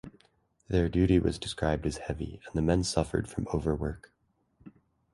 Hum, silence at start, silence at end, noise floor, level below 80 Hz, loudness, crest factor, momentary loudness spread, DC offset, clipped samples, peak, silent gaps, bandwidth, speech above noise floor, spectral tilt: none; 0.05 s; 0.45 s; -68 dBFS; -42 dBFS; -30 LUFS; 20 dB; 11 LU; under 0.1%; under 0.1%; -10 dBFS; none; 11.5 kHz; 39 dB; -6 dB/octave